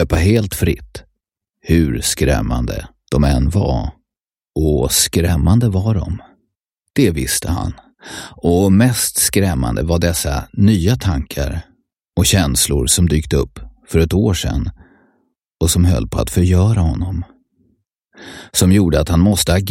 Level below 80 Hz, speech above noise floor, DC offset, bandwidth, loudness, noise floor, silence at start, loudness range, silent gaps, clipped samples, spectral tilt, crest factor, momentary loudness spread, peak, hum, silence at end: -26 dBFS; 74 dB; under 0.1%; 16.5 kHz; -16 LUFS; -88 dBFS; 0 s; 2 LU; none; under 0.1%; -5 dB/octave; 16 dB; 14 LU; 0 dBFS; none; 0 s